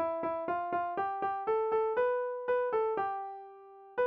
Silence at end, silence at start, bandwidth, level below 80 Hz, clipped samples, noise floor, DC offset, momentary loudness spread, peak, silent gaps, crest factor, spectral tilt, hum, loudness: 0 s; 0 s; 5.2 kHz; -72 dBFS; under 0.1%; -52 dBFS; under 0.1%; 12 LU; -20 dBFS; none; 12 dB; -3.5 dB/octave; none; -33 LUFS